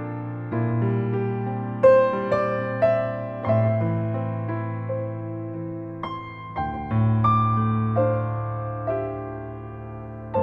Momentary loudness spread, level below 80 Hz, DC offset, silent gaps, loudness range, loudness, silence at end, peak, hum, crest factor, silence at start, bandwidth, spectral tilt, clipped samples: 13 LU; -50 dBFS; under 0.1%; none; 5 LU; -24 LUFS; 0 s; -4 dBFS; none; 18 dB; 0 s; 4.6 kHz; -10.5 dB/octave; under 0.1%